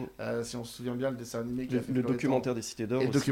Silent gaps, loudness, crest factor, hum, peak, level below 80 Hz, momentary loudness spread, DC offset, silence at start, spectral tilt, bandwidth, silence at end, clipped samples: none; -32 LUFS; 18 dB; none; -14 dBFS; -62 dBFS; 8 LU; under 0.1%; 0 s; -6 dB/octave; 16.5 kHz; 0 s; under 0.1%